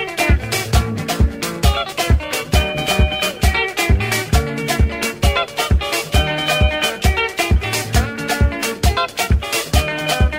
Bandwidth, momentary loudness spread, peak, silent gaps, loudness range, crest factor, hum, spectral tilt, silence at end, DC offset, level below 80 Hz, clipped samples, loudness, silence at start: 16.5 kHz; 2 LU; -2 dBFS; none; 1 LU; 16 dB; none; -4 dB/octave; 0 s; under 0.1%; -20 dBFS; under 0.1%; -17 LUFS; 0 s